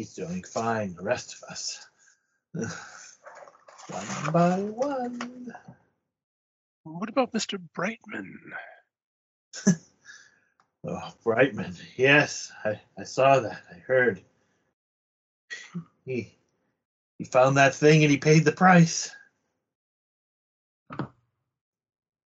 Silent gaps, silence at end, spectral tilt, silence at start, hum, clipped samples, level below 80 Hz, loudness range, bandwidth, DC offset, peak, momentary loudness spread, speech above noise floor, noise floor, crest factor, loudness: 6.23-6.84 s, 9.04-9.52 s, 14.73-15.48 s, 16.85-17.19 s, 19.75-20.86 s; 1.3 s; -5 dB/octave; 0 s; none; under 0.1%; -70 dBFS; 12 LU; 8 kHz; under 0.1%; -6 dBFS; 22 LU; 47 dB; -72 dBFS; 22 dB; -24 LUFS